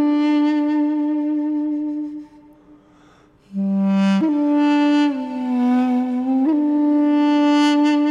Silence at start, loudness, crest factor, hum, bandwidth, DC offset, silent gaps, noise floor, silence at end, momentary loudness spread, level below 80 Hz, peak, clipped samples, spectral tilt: 0 s; -18 LUFS; 12 dB; none; 7.6 kHz; under 0.1%; none; -51 dBFS; 0 s; 9 LU; -64 dBFS; -6 dBFS; under 0.1%; -7 dB/octave